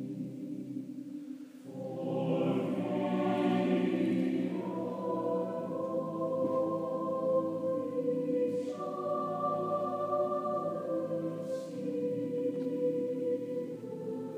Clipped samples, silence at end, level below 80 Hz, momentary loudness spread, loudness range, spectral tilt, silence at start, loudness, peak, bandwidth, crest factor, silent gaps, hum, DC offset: under 0.1%; 0 s; -86 dBFS; 10 LU; 3 LU; -8.5 dB/octave; 0 s; -34 LUFS; -18 dBFS; 15.5 kHz; 16 dB; none; none; under 0.1%